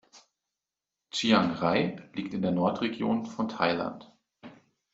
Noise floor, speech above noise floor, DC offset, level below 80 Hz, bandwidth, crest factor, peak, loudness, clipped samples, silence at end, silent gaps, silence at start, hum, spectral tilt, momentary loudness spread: -89 dBFS; 61 dB; under 0.1%; -68 dBFS; 8 kHz; 22 dB; -8 dBFS; -28 LUFS; under 0.1%; 0.4 s; none; 0.15 s; none; -5.5 dB/octave; 11 LU